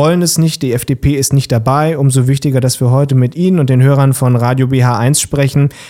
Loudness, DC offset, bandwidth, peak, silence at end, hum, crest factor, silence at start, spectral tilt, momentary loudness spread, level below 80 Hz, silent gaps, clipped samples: -11 LUFS; 0.1%; 16 kHz; 0 dBFS; 0 s; none; 10 dB; 0 s; -6 dB/octave; 3 LU; -36 dBFS; none; under 0.1%